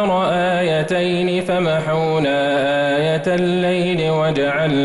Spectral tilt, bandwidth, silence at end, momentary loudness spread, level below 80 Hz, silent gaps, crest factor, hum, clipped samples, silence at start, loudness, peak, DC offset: -6.5 dB/octave; 11.5 kHz; 0 s; 1 LU; -50 dBFS; none; 8 dB; none; under 0.1%; 0 s; -17 LUFS; -8 dBFS; under 0.1%